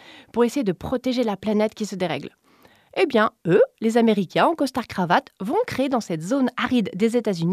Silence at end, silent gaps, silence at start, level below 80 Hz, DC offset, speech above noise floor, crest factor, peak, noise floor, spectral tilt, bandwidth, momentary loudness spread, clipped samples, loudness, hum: 0 s; none; 0.1 s; -58 dBFS; under 0.1%; 34 dB; 18 dB; -4 dBFS; -55 dBFS; -6 dB/octave; 14.5 kHz; 7 LU; under 0.1%; -22 LUFS; none